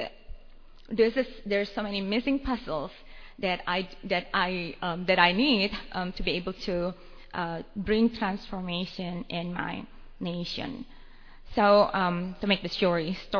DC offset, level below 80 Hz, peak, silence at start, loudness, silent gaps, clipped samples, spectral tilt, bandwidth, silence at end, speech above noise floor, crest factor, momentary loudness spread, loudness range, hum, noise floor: under 0.1%; -46 dBFS; -6 dBFS; 0 s; -28 LUFS; none; under 0.1%; -6.5 dB/octave; 5.4 kHz; 0 s; 20 dB; 24 dB; 14 LU; 5 LU; none; -48 dBFS